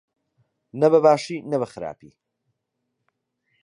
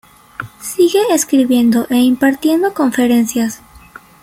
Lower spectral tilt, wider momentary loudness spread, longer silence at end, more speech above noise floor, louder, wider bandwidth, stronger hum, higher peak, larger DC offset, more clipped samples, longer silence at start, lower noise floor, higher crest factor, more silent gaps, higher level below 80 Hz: first, -6.5 dB/octave vs -4 dB/octave; first, 19 LU vs 16 LU; first, 1.7 s vs 0.45 s; first, 58 dB vs 27 dB; second, -20 LUFS vs -13 LUFS; second, 10.5 kHz vs 16.5 kHz; neither; second, -4 dBFS vs 0 dBFS; neither; neither; first, 0.75 s vs 0.4 s; first, -78 dBFS vs -40 dBFS; first, 20 dB vs 14 dB; neither; second, -68 dBFS vs -52 dBFS